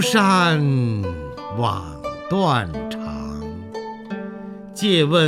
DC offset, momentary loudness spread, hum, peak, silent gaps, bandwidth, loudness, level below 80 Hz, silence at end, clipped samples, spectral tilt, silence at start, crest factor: under 0.1%; 16 LU; none; -2 dBFS; none; 16 kHz; -21 LUFS; -44 dBFS; 0 s; under 0.1%; -5.5 dB/octave; 0 s; 18 dB